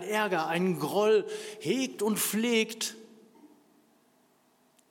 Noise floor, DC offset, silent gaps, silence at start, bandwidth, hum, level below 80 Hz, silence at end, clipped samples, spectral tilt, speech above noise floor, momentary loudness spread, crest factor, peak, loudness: -67 dBFS; under 0.1%; none; 0 s; 17 kHz; none; -88 dBFS; 1.45 s; under 0.1%; -4 dB/octave; 38 dB; 10 LU; 18 dB; -14 dBFS; -29 LUFS